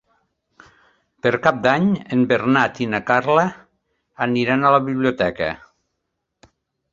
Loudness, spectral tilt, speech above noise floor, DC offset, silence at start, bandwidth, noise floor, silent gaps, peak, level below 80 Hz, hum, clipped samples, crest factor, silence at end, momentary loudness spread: -19 LUFS; -7 dB/octave; 59 dB; under 0.1%; 1.25 s; 7.4 kHz; -77 dBFS; none; 0 dBFS; -54 dBFS; none; under 0.1%; 20 dB; 1.35 s; 8 LU